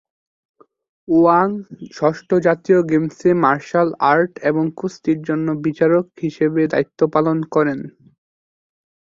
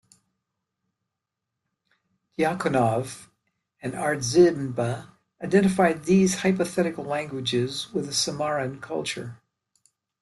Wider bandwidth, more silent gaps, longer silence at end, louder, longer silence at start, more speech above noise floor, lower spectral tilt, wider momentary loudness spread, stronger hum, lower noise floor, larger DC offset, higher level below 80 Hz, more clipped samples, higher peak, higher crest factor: second, 7.6 kHz vs 12.5 kHz; neither; first, 1.15 s vs 0.85 s; first, -18 LUFS vs -24 LUFS; second, 1.1 s vs 2.4 s; first, over 73 dB vs 61 dB; first, -8 dB/octave vs -5 dB/octave; second, 7 LU vs 16 LU; neither; first, under -90 dBFS vs -84 dBFS; neither; about the same, -60 dBFS vs -62 dBFS; neither; first, -2 dBFS vs -6 dBFS; about the same, 16 dB vs 20 dB